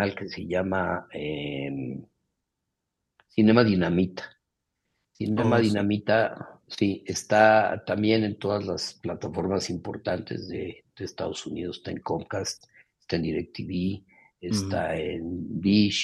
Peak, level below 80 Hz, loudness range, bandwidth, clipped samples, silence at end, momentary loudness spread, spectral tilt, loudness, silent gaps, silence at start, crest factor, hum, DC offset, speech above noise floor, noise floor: -4 dBFS; -58 dBFS; 9 LU; 12 kHz; under 0.1%; 0 s; 15 LU; -5.5 dB/octave; -26 LUFS; none; 0 s; 22 dB; none; under 0.1%; 57 dB; -83 dBFS